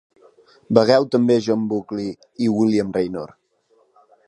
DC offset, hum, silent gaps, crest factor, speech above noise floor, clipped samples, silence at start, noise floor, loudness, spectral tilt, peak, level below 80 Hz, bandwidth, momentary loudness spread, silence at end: under 0.1%; none; none; 20 dB; 42 dB; under 0.1%; 0.7 s; -61 dBFS; -19 LUFS; -6.5 dB/octave; 0 dBFS; -60 dBFS; 10.5 kHz; 13 LU; 1 s